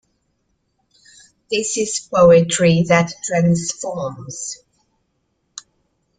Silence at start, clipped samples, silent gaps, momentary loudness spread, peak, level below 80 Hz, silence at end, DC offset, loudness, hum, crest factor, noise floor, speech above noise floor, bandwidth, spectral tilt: 1.5 s; under 0.1%; none; 25 LU; -2 dBFS; -52 dBFS; 1.65 s; under 0.1%; -17 LUFS; none; 18 dB; -69 dBFS; 52 dB; 9.6 kHz; -5 dB/octave